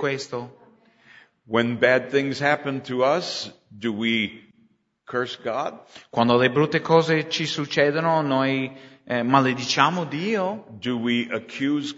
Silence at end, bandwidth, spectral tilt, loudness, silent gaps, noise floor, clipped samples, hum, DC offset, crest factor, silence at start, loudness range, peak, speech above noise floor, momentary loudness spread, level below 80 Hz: 0 s; 8 kHz; -5 dB/octave; -23 LUFS; none; -62 dBFS; under 0.1%; none; under 0.1%; 22 dB; 0 s; 5 LU; -2 dBFS; 39 dB; 11 LU; -68 dBFS